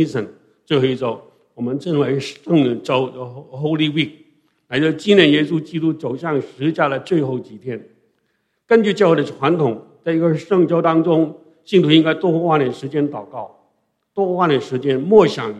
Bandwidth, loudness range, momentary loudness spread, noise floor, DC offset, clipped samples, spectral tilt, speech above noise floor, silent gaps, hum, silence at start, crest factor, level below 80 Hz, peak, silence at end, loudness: 9.4 kHz; 4 LU; 15 LU; -68 dBFS; under 0.1%; under 0.1%; -7 dB/octave; 51 dB; none; none; 0 s; 18 dB; -62 dBFS; 0 dBFS; 0 s; -17 LUFS